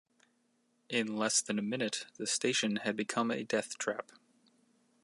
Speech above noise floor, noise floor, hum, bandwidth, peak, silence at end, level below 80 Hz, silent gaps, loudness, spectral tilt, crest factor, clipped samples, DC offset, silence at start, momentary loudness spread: 41 dB; -75 dBFS; none; 11.5 kHz; -16 dBFS; 1 s; -84 dBFS; none; -33 LUFS; -2.5 dB/octave; 20 dB; under 0.1%; under 0.1%; 0.9 s; 7 LU